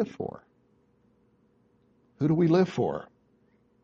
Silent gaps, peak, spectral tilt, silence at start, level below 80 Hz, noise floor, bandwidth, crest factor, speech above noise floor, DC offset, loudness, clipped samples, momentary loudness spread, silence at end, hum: none; -12 dBFS; -8.5 dB/octave; 0 s; -66 dBFS; -66 dBFS; 7.4 kHz; 18 dB; 40 dB; under 0.1%; -27 LUFS; under 0.1%; 16 LU; 0.8 s; none